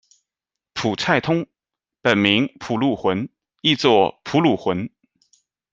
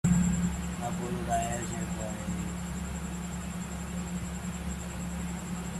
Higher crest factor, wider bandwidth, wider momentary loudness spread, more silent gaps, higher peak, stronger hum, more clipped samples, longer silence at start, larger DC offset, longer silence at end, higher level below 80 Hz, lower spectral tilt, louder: about the same, 20 dB vs 18 dB; second, 7.8 kHz vs 13.5 kHz; first, 11 LU vs 7 LU; neither; first, -2 dBFS vs -14 dBFS; neither; neither; first, 0.75 s vs 0.05 s; neither; first, 0.85 s vs 0 s; second, -60 dBFS vs -42 dBFS; about the same, -5.5 dB/octave vs -5.5 dB/octave; first, -20 LUFS vs -34 LUFS